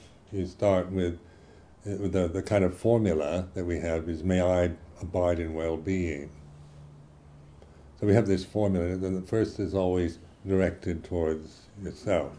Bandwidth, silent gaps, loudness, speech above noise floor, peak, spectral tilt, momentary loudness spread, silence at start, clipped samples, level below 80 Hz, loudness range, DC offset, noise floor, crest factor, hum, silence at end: 10.5 kHz; none; -28 LUFS; 26 dB; -8 dBFS; -7.5 dB/octave; 13 LU; 0.05 s; under 0.1%; -48 dBFS; 3 LU; under 0.1%; -53 dBFS; 22 dB; none; 0 s